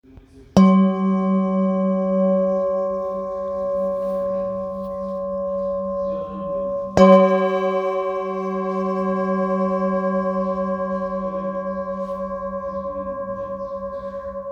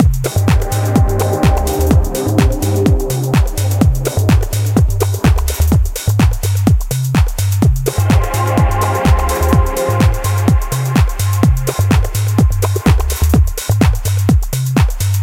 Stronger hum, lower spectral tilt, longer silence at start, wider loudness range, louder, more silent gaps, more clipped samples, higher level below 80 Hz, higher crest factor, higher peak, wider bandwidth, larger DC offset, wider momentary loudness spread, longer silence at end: neither; first, -8.5 dB/octave vs -6 dB/octave; first, 0.15 s vs 0 s; first, 7 LU vs 1 LU; second, -21 LUFS vs -14 LUFS; neither; neither; second, -50 dBFS vs -18 dBFS; first, 20 dB vs 12 dB; about the same, 0 dBFS vs 0 dBFS; second, 7.2 kHz vs 17 kHz; neither; first, 13 LU vs 2 LU; about the same, 0 s vs 0 s